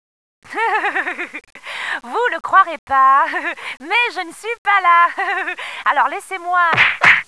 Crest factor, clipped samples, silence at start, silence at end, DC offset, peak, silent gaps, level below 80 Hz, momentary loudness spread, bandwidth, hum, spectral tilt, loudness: 18 dB; under 0.1%; 0.5 s; 0.05 s; 0.2%; 0 dBFS; 2.79-2.87 s, 4.58-4.65 s; -60 dBFS; 14 LU; 11 kHz; none; -2.5 dB/octave; -16 LUFS